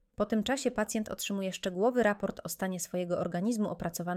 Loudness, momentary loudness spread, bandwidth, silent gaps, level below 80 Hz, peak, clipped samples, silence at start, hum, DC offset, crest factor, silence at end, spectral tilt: -32 LUFS; 7 LU; 16.5 kHz; none; -60 dBFS; -16 dBFS; under 0.1%; 0.2 s; none; under 0.1%; 16 dB; 0 s; -4.5 dB/octave